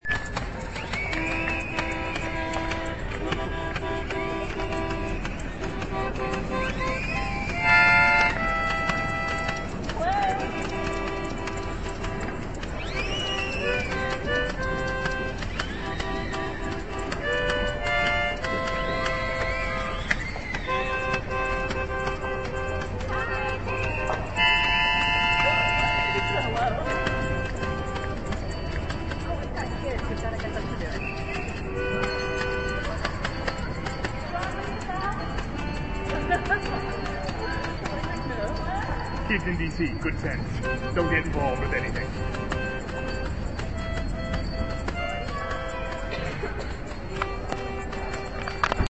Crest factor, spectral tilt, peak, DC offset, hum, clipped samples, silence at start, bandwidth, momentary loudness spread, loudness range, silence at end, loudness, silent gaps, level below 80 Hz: 22 dB; -5 dB/octave; -4 dBFS; 0.9%; none; under 0.1%; 0 s; 8.6 kHz; 9 LU; 9 LU; 0.05 s; -27 LUFS; none; -36 dBFS